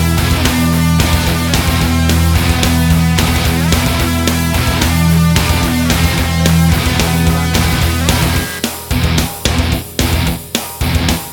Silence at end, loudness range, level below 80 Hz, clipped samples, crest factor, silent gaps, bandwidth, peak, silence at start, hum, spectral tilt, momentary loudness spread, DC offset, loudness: 0 s; 2 LU; -20 dBFS; under 0.1%; 12 dB; none; over 20 kHz; 0 dBFS; 0 s; none; -4.5 dB/octave; 5 LU; under 0.1%; -13 LUFS